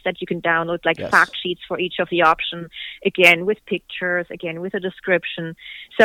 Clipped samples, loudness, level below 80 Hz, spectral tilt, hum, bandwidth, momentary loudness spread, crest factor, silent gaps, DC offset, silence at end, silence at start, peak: under 0.1%; -19 LUFS; -56 dBFS; -4.5 dB/octave; none; 19 kHz; 15 LU; 20 dB; none; under 0.1%; 0 s; 0.05 s; 0 dBFS